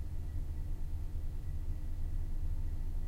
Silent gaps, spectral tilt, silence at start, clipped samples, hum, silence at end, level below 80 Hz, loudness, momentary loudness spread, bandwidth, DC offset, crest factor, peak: none; -7.5 dB/octave; 0 s; under 0.1%; none; 0 s; -36 dBFS; -43 LUFS; 2 LU; 4.3 kHz; under 0.1%; 10 dB; -26 dBFS